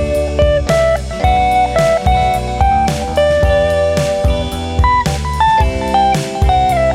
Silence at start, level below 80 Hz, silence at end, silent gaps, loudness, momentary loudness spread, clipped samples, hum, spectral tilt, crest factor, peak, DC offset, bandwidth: 0 s; -20 dBFS; 0 s; none; -13 LUFS; 4 LU; under 0.1%; none; -5.5 dB/octave; 12 dB; -2 dBFS; under 0.1%; 15 kHz